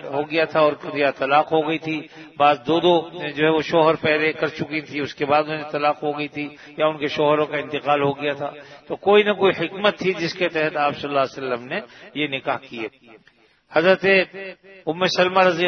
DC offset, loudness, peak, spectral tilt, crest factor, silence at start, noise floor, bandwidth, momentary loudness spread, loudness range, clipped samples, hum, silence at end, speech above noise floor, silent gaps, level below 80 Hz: under 0.1%; -21 LUFS; -2 dBFS; -5.5 dB/octave; 20 dB; 0 s; -57 dBFS; 6.6 kHz; 13 LU; 4 LU; under 0.1%; none; 0 s; 36 dB; none; -64 dBFS